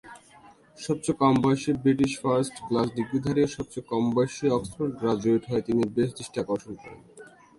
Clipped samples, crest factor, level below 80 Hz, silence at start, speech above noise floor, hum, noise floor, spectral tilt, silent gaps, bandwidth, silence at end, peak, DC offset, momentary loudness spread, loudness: under 0.1%; 18 dB; -56 dBFS; 0.05 s; 28 dB; none; -54 dBFS; -6.5 dB/octave; none; 11.5 kHz; 0.3 s; -8 dBFS; under 0.1%; 9 LU; -26 LUFS